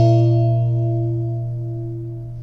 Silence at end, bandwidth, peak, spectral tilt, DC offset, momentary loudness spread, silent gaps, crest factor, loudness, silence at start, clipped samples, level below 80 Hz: 0 s; 5.6 kHz; -4 dBFS; -10.5 dB/octave; under 0.1%; 13 LU; none; 14 dB; -20 LUFS; 0 s; under 0.1%; -44 dBFS